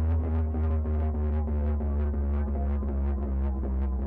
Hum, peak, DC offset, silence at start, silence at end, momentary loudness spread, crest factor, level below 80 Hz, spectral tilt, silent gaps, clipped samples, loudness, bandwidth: none; -20 dBFS; under 0.1%; 0 s; 0 s; 2 LU; 6 dB; -28 dBFS; -12 dB/octave; none; under 0.1%; -29 LUFS; 2.7 kHz